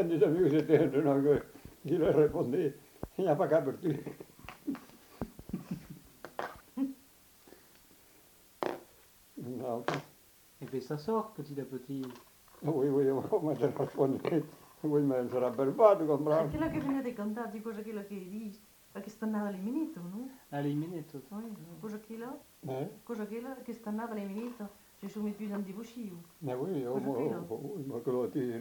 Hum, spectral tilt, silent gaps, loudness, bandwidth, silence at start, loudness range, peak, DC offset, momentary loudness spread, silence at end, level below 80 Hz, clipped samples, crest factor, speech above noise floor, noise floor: none; -7.5 dB/octave; none; -34 LUFS; 19 kHz; 0 s; 13 LU; -10 dBFS; under 0.1%; 18 LU; 0 s; -64 dBFS; under 0.1%; 24 dB; 29 dB; -61 dBFS